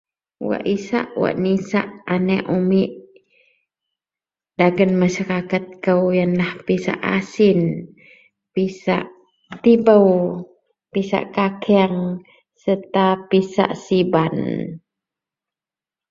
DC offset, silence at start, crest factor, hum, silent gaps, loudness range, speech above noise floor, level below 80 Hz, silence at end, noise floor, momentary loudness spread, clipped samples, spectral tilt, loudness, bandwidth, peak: under 0.1%; 0.4 s; 18 dB; none; none; 4 LU; over 72 dB; -58 dBFS; 1.3 s; under -90 dBFS; 11 LU; under 0.1%; -7.5 dB/octave; -19 LUFS; 7.4 kHz; -2 dBFS